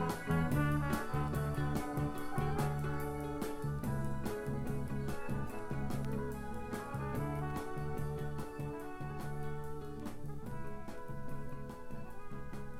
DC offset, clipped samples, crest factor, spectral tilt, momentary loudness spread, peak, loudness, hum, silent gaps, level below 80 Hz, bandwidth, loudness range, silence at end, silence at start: under 0.1%; under 0.1%; 16 dB; -7 dB/octave; 12 LU; -20 dBFS; -40 LUFS; none; none; -48 dBFS; 16.5 kHz; 8 LU; 0 s; 0 s